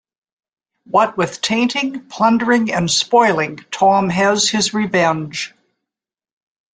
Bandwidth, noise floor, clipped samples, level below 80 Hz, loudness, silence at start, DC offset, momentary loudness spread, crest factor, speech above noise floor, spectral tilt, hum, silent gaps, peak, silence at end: 9.6 kHz; -87 dBFS; under 0.1%; -56 dBFS; -16 LUFS; 0.9 s; under 0.1%; 9 LU; 16 dB; 71 dB; -3.5 dB/octave; none; none; -2 dBFS; 1.25 s